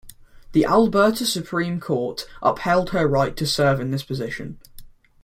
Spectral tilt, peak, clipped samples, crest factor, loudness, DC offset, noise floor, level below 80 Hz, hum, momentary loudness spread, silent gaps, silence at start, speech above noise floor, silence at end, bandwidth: -5.5 dB/octave; -4 dBFS; under 0.1%; 18 dB; -21 LUFS; under 0.1%; -43 dBFS; -46 dBFS; none; 11 LU; none; 0.05 s; 22 dB; 0.35 s; 16.5 kHz